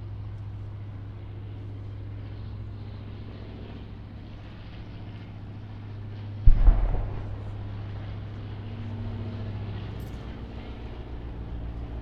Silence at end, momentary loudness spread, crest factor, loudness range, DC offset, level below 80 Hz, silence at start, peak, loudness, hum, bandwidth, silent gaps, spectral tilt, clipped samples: 0 s; 13 LU; 26 dB; 10 LU; under 0.1%; -30 dBFS; 0 s; -2 dBFS; -35 LUFS; none; 5 kHz; none; -9 dB/octave; under 0.1%